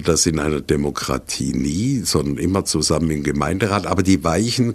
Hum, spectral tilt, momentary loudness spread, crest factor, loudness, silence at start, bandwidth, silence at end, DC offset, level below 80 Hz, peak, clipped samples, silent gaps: none; -4.5 dB/octave; 5 LU; 16 dB; -19 LUFS; 0 s; 14 kHz; 0 s; under 0.1%; -36 dBFS; -2 dBFS; under 0.1%; none